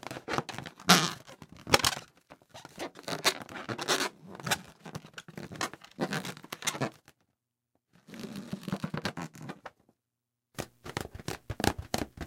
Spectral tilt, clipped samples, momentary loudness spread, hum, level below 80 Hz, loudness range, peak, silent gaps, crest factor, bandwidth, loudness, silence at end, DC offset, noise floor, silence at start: -3 dB/octave; under 0.1%; 20 LU; none; -56 dBFS; 12 LU; -2 dBFS; none; 34 dB; 16.5 kHz; -32 LUFS; 0 s; under 0.1%; -87 dBFS; 0.05 s